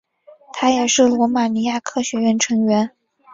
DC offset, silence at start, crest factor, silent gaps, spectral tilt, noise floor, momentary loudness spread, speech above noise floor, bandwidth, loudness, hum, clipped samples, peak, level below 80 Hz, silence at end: under 0.1%; 0.55 s; 16 dB; none; -3.5 dB/octave; -47 dBFS; 8 LU; 30 dB; 7.8 kHz; -18 LUFS; none; under 0.1%; -2 dBFS; -60 dBFS; 0.45 s